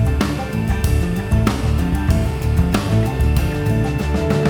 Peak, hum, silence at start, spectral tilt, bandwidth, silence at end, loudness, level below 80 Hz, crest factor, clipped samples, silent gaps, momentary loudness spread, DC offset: 0 dBFS; none; 0 s; -7 dB/octave; 19 kHz; 0 s; -19 LUFS; -22 dBFS; 16 dB; under 0.1%; none; 2 LU; under 0.1%